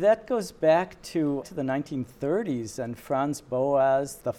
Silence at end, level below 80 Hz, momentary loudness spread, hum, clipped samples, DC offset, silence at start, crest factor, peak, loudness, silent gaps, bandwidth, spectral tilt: 0 s; -60 dBFS; 9 LU; none; under 0.1%; under 0.1%; 0 s; 16 dB; -10 dBFS; -27 LUFS; none; 15 kHz; -6 dB/octave